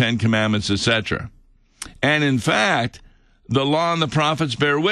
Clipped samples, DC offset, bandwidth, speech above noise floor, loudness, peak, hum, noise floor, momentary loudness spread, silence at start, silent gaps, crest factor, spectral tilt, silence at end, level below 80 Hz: under 0.1%; under 0.1%; 12.5 kHz; 21 dB; -19 LUFS; -4 dBFS; none; -41 dBFS; 10 LU; 0 s; none; 16 dB; -5 dB/octave; 0 s; -48 dBFS